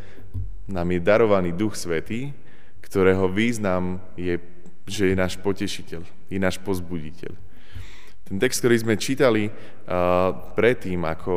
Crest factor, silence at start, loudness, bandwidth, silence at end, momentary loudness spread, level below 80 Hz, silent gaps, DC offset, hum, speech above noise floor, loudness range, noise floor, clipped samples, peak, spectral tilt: 20 dB; 0.05 s; -23 LUFS; 15.5 kHz; 0 s; 18 LU; -46 dBFS; none; 4%; none; 26 dB; 5 LU; -49 dBFS; under 0.1%; -4 dBFS; -5.5 dB/octave